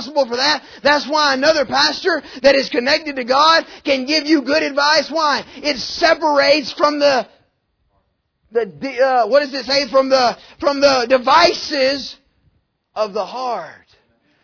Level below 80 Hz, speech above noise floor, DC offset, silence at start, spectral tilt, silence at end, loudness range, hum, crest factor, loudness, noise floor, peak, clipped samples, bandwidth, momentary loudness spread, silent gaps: -54 dBFS; 50 dB; under 0.1%; 0 s; -2.5 dB/octave; 0.7 s; 3 LU; none; 16 dB; -15 LUFS; -66 dBFS; -2 dBFS; under 0.1%; 5.4 kHz; 10 LU; none